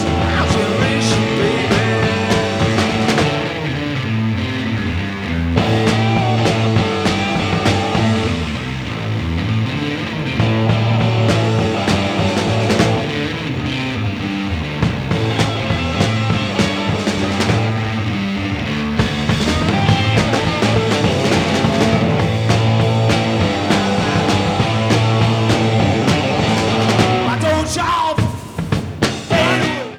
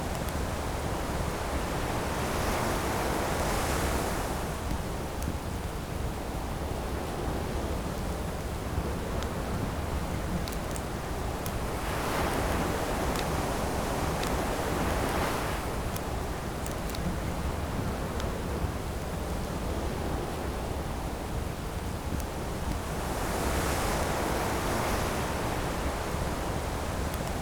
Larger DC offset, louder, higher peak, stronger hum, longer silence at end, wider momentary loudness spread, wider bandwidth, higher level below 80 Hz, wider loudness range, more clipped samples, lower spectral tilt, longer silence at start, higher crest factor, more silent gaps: neither; first, -16 LUFS vs -32 LUFS; first, 0 dBFS vs -16 dBFS; neither; about the same, 0 s vs 0 s; about the same, 6 LU vs 5 LU; second, 13.5 kHz vs over 20 kHz; about the same, -34 dBFS vs -38 dBFS; about the same, 3 LU vs 4 LU; neither; about the same, -5.5 dB/octave vs -5 dB/octave; about the same, 0 s vs 0 s; about the same, 16 dB vs 14 dB; neither